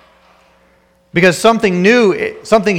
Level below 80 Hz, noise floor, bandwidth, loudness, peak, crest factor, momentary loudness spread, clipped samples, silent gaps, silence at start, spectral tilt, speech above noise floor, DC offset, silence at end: -48 dBFS; -53 dBFS; 16.5 kHz; -12 LUFS; 0 dBFS; 14 dB; 7 LU; under 0.1%; none; 1.15 s; -5 dB/octave; 41 dB; under 0.1%; 0 s